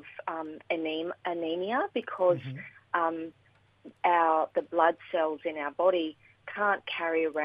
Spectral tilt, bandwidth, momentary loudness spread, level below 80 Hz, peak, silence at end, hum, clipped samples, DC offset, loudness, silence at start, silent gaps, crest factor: -7.5 dB/octave; 5.2 kHz; 12 LU; -80 dBFS; -10 dBFS; 0 s; none; under 0.1%; under 0.1%; -30 LUFS; 0.05 s; none; 20 dB